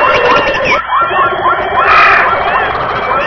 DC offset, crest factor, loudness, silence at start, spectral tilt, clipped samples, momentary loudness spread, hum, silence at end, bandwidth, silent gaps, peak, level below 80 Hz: under 0.1%; 10 dB; -9 LUFS; 0 s; -4.5 dB/octave; 0.5%; 7 LU; none; 0 s; 5.4 kHz; none; 0 dBFS; -36 dBFS